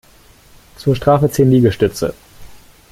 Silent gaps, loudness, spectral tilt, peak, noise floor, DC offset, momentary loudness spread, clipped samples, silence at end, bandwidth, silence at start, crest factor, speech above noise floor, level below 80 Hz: none; -15 LUFS; -7 dB/octave; 0 dBFS; -46 dBFS; under 0.1%; 11 LU; under 0.1%; 0.35 s; 16 kHz; 0.8 s; 16 dB; 33 dB; -42 dBFS